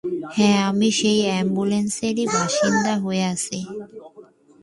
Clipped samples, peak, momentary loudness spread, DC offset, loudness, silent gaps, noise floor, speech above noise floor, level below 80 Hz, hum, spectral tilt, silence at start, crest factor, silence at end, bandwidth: under 0.1%; -6 dBFS; 10 LU; under 0.1%; -20 LUFS; none; -48 dBFS; 27 dB; -60 dBFS; none; -4.5 dB/octave; 0.05 s; 16 dB; 0.4 s; 11.5 kHz